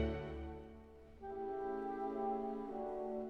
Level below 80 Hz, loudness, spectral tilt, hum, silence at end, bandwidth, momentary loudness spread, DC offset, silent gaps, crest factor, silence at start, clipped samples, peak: -54 dBFS; -43 LUFS; -9 dB/octave; none; 0 s; 6.4 kHz; 14 LU; under 0.1%; none; 16 dB; 0 s; under 0.1%; -26 dBFS